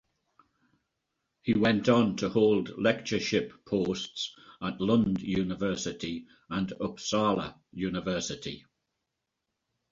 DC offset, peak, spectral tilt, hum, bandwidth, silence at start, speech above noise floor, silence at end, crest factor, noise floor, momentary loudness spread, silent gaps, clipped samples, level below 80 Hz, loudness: under 0.1%; -10 dBFS; -5.5 dB/octave; none; 7.6 kHz; 1.45 s; 56 dB; 1.35 s; 20 dB; -84 dBFS; 12 LU; none; under 0.1%; -58 dBFS; -29 LUFS